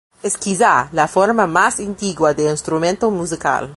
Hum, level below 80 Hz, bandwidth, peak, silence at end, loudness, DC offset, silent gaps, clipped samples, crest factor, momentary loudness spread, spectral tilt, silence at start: none; -50 dBFS; 11.5 kHz; 0 dBFS; 0 s; -17 LUFS; under 0.1%; none; under 0.1%; 16 dB; 7 LU; -4 dB/octave; 0.25 s